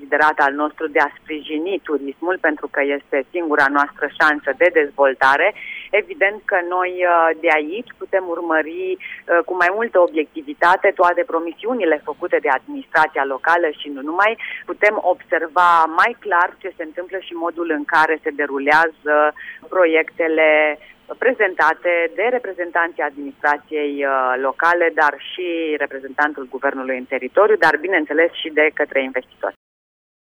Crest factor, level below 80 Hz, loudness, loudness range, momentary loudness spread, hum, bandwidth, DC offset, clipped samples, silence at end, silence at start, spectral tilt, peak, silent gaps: 16 dB; -64 dBFS; -18 LUFS; 2 LU; 10 LU; none; over 20 kHz; under 0.1%; under 0.1%; 0.75 s; 0 s; -4 dB/octave; -2 dBFS; none